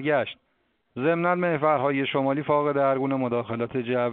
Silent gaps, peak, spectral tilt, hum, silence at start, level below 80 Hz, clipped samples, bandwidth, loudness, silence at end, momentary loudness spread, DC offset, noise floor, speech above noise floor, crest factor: none; -8 dBFS; -5 dB/octave; none; 0 s; -68 dBFS; under 0.1%; 4.4 kHz; -25 LUFS; 0 s; 6 LU; under 0.1%; -71 dBFS; 47 dB; 16 dB